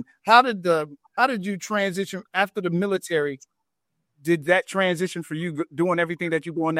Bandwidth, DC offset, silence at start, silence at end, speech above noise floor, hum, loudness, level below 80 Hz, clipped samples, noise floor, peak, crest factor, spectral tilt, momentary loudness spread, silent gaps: 15.5 kHz; under 0.1%; 0 s; 0 s; 56 dB; none; -23 LUFS; -72 dBFS; under 0.1%; -79 dBFS; -2 dBFS; 22 dB; -5 dB/octave; 13 LU; none